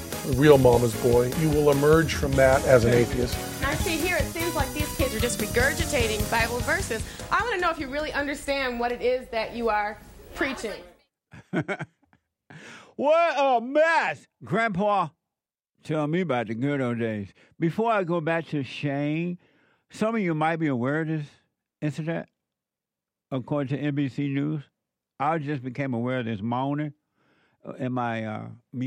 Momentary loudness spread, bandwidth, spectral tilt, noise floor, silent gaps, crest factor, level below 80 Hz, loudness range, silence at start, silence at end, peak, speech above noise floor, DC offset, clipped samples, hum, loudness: 14 LU; 16 kHz; -5.5 dB/octave; -89 dBFS; none; 22 dB; -42 dBFS; 9 LU; 0 s; 0 s; -4 dBFS; 64 dB; under 0.1%; under 0.1%; none; -25 LUFS